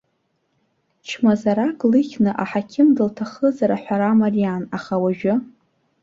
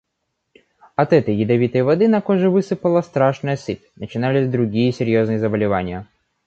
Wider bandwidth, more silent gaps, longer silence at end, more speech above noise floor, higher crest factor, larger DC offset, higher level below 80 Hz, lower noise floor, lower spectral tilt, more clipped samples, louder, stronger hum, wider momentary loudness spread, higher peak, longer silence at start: about the same, 7.6 kHz vs 8 kHz; neither; first, 0.6 s vs 0.45 s; second, 51 dB vs 57 dB; about the same, 14 dB vs 16 dB; neither; second, -62 dBFS vs -50 dBFS; second, -69 dBFS vs -75 dBFS; about the same, -7.5 dB/octave vs -8 dB/octave; neither; about the same, -19 LUFS vs -18 LUFS; neither; second, 7 LU vs 11 LU; second, -6 dBFS vs -2 dBFS; about the same, 1.05 s vs 1 s